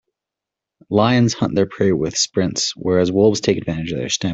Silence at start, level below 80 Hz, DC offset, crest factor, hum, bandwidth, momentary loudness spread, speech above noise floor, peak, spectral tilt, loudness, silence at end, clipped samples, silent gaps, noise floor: 0.9 s; -50 dBFS; under 0.1%; 16 dB; none; 8.4 kHz; 6 LU; 68 dB; -2 dBFS; -4.5 dB/octave; -18 LUFS; 0 s; under 0.1%; none; -85 dBFS